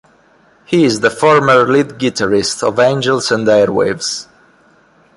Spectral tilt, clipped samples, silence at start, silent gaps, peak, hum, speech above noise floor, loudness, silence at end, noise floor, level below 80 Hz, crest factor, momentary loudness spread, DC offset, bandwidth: -4.5 dB/octave; under 0.1%; 0.7 s; none; 0 dBFS; none; 38 dB; -13 LUFS; 0.95 s; -50 dBFS; -52 dBFS; 14 dB; 8 LU; under 0.1%; 11.5 kHz